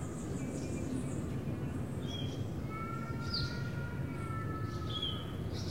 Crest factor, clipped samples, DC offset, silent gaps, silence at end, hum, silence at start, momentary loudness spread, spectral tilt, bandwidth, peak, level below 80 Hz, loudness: 14 dB; under 0.1%; 0.2%; none; 0 s; none; 0 s; 4 LU; -6 dB/octave; 16 kHz; -24 dBFS; -50 dBFS; -39 LUFS